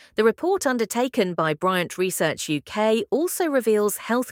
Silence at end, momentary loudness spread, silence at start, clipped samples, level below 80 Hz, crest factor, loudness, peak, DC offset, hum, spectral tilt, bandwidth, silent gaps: 0 s; 4 LU; 0.2 s; under 0.1%; -66 dBFS; 16 dB; -23 LUFS; -6 dBFS; under 0.1%; none; -4 dB/octave; 17.5 kHz; none